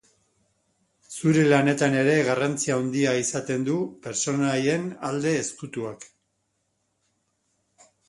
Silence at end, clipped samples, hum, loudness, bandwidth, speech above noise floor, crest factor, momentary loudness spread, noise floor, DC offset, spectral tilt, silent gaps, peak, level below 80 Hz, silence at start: 2 s; under 0.1%; none; -24 LUFS; 11.5 kHz; 51 dB; 22 dB; 13 LU; -74 dBFS; under 0.1%; -5 dB/octave; none; -4 dBFS; -66 dBFS; 1.1 s